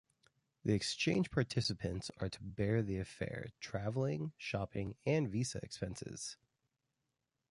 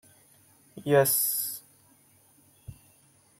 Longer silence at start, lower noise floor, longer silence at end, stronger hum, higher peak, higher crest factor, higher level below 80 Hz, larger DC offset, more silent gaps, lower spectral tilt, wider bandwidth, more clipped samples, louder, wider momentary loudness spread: about the same, 0.65 s vs 0.75 s; first, -87 dBFS vs -62 dBFS; first, 1.15 s vs 0.65 s; neither; second, -20 dBFS vs -8 dBFS; about the same, 20 dB vs 22 dB; first, -60 dBFS vs -66 dBFS; neither; neither; first, -5.5 dB/octave vs -3.5 dB/octave; second, 11.5 kHz vs 16.5 kHz; neither; second, -39 LUFS vs -25 LUFS; second, 10 LU vs 18 LU